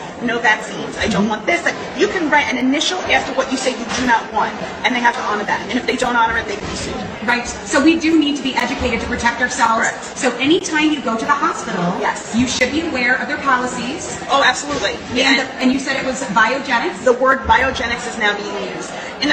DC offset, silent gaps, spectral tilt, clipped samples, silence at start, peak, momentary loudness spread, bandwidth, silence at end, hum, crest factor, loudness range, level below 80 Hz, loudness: under 0.1%; none; -3.5 dB/octave; under 0.1%; 0 s; 0 dBFS; 7 LU; 9.6 kHz; 0 s; none; 16 dB; 2 LU; -42 dBFS; -17 LUFS